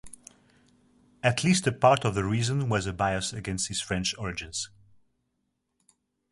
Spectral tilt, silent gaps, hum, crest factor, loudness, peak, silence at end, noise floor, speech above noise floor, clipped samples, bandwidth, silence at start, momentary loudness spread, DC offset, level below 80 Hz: -4.5 dB/octave; none; none; 22 dB; -27 LUFS; -6 dBFS; 1.65 s; -78 dBFS; 52 dB; under 0.1%; 11.5 kHz; 0.05 s; 12 LU; under 0.1%; -52 dBFS